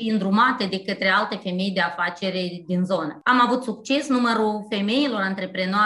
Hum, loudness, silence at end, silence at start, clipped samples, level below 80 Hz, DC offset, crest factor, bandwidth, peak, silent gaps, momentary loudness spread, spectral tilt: none; -22 LUFS; 0 s; 0 s; under 0.1%; -68 dBFS; under 0.1%; 16 dB; 11.5 kHz; -6 dBFS; none; 7 LU; -5.5 dB/octave